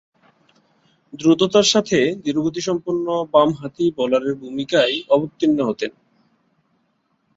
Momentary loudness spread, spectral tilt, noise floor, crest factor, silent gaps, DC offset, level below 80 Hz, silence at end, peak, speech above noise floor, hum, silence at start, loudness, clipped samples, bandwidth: 8 LU; -4.5 dB/octave; -67 dBFS; 18 dB; none; under 0.1%; -60 dBFS; 1.45 s; -2 dBFS; 48 dB; none; 1.15 s; -19 LUFS; under 0.1%; 7.8 kHz